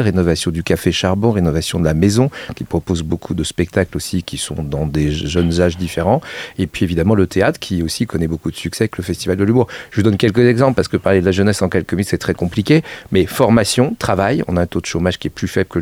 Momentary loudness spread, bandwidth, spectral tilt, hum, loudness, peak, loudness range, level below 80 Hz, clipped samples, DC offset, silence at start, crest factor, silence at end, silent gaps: 8 LU; 16.5 kHz; -6 dB/octave; none; -17 LUFS; 0 dBFS; 3 LU; -34 dBFS; under 0.1%; under 0.1%; 0 s; 16 dB; 0 s; none